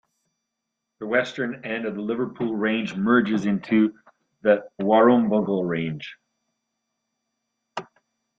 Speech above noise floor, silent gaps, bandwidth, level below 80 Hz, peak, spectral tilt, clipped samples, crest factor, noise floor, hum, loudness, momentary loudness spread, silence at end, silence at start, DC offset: 60 dB; none; 7.6 kHz; -66 dBFS; -4 dBFS; -7 dB/octave; under 0.1%; 20 dB; -82 dBFS; none; -23 LUFS; 19 LU; 0.55 s; 1 s; under 0.1%